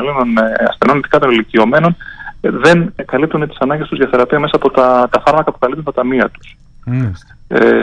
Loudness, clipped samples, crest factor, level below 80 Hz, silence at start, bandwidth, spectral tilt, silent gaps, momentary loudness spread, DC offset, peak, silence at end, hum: -13 LUFS; under 0.1%; 12 dB; -40 dBFS; 0 s; 10 kHz; -7 dB/octave; none; 8 LU; under 0.1%; 0 dBFS; 0 s; none